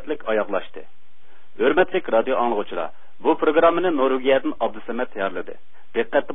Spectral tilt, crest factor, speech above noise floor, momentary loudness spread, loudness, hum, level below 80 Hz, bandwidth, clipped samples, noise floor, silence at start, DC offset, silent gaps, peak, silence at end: -9.5 dB/octave; 18 dB; 37 dB; 12 LU; -22 LUFS; none; -58 dBFS; 3.9 kHz; under 0.1%; -59 dBFS; 0.05 s; 4%; none; -4 dBFS; 0 s